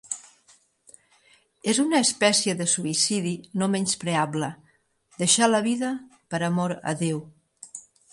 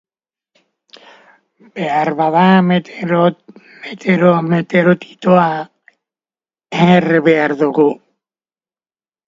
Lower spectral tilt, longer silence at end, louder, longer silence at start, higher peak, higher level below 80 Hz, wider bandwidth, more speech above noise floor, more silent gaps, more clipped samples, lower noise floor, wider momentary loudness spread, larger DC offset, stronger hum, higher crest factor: second, -3.5 dB/octave vs -8 dB/octave; second, 0.3 s vs 1.3 s; second, -24 LUFS vs -14 LUFS; second, 0.05 s vs 1.75 s; second, -6 dBFS vs 0 dBFS; second, -70 dBFS vs -60 dBFS; first, 11.5 kHz vs 7.4 kHz; second, 39 dB vs over 77 dB; neither; neither; second, -63 dBFS vs under -90 dBFS; about the same, 15 LU vs 14 LU; neither; neither; first, 22 dB vs 16 dB